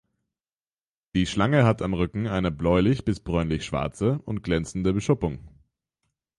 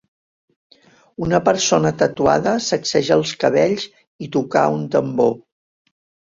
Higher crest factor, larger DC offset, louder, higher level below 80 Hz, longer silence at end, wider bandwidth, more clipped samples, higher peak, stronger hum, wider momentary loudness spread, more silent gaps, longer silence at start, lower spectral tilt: about the same, 18 dB vs 20 dB; neither; second, -25 LUFS vs -18 LUFS; first, -42 dBFS vs -52 dBFS; about the same, 0.9 s vs 0.95 s; first, 11.5 kHz vs 7.8 kHz; neither; second, -8 dBFS vs 0 dBFS; neither; second, 7 LU vs 10 LU; second, none vs 4.07-4.19 s; about the same, 1.15 s vs 1.2 s; first, -7 dB/octave vs -4.5 dB/octave